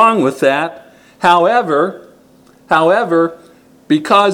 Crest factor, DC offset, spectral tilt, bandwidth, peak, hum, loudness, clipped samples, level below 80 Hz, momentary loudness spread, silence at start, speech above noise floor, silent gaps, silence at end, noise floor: 14 dB; under 0.1%; -5.5 dB/octave; 16 kHz; 0 dBFS; none; -13 LUFS; 0.1%; -60 dBFS; 8 LU; 0 s; 34 dB; none; 0 s; -46 dBFS